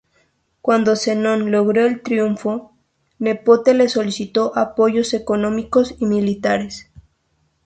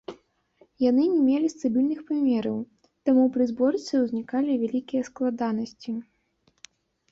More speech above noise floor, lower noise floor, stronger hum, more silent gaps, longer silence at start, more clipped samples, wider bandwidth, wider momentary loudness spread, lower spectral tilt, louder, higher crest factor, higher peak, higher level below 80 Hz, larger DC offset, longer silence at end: first, 48 dB vs 44 dB; about the same, -65 dBFS vs -68 dBFS; neither; neither; first, 0.65 s vs 0.1 s; neither; first, 9.2 kHz vs 7.6 kHz; second, 8 LU vs 12 LU; about the same, -5.5 dB/octave vs -6.5 dB/octave; first, -18 LUFS vs -25 LUFS; about the same, 16 dB vs 14 dB; first, -2 dBFS vs -10 dBFS; first, -54 dBFS vs -66 dBFS; neither; second, 0.85 s vs 1.1 s